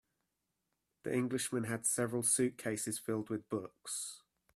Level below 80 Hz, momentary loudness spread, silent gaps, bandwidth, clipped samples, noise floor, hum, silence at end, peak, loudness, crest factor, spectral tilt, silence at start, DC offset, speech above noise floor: -76 dBFS; 11 LU; none; 15.5 kHz; under 0.1%; -86 dBFS; none; 0.4 s; -20 dBFS; -36 LUFS; 18 dB; -4 dB/octave; 1.05 s; under 0.1%; 49 dB